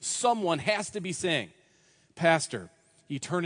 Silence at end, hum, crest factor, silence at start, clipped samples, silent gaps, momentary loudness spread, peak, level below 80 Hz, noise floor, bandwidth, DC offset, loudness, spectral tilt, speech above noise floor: 0 s; none; 22 dB; 0 s; under 0.1%; none; 14 LU; -8 dBFS; -72 dBFS; -64 dBFS; 10.5 kHz; under 0.1%; -28 LUFS; -3.5 dB/octave; 36 dB